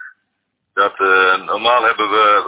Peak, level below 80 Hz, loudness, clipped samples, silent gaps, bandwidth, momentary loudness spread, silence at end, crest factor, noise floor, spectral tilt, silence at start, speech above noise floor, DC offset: -2 dBFS; -62 dBFS; -14 LUFS; under 0.1%; none; 4 kHz; 6 LU; 0 s; 14 dB; -72 dBFS; -5.5 dB/octave; 0 s; 58 dB; under 0.1%